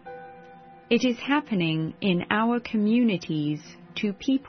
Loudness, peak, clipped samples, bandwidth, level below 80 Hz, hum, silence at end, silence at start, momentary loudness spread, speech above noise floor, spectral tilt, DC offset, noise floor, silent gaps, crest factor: -25 LUFS; -8 dBFS; under 0.1%; 6.4 kHz; -64 dBFS; none; 0 s; 0.05 s; 13 LU; 23 dB; -6.5 dB/octave; under 0.1%; -48 dBFS; none; 18 dB